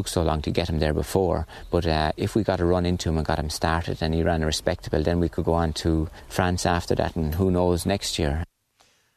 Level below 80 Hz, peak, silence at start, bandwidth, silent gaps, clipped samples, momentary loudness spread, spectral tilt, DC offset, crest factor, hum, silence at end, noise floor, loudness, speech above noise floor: -36 dBFS; -4 dBFS; 0 s; 14 kHz; none; under 0.1%; 4 LU; -5.5 dB/octave; under 0.1%; 20 dB; none; 0.7 s; -63 dBFS; -25 LUFS; 39 dB